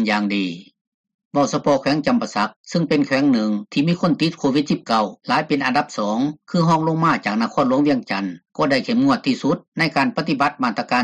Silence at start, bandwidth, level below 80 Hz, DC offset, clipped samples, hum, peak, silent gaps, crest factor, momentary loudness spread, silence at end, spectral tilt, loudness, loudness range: 0 s; 9.8 kHz; -60 dBFS; under 0.1%; under 0.1%; none; -6 dBFS; 0.81-1.04 s, 1.14-1.19 s, 1.25-1.31 s, 2.56-2.64 s, 9.68-9.72 s; 14 dB; 6 LU; 0 s; -6 dB/octave; -20 LUFS; 1 LU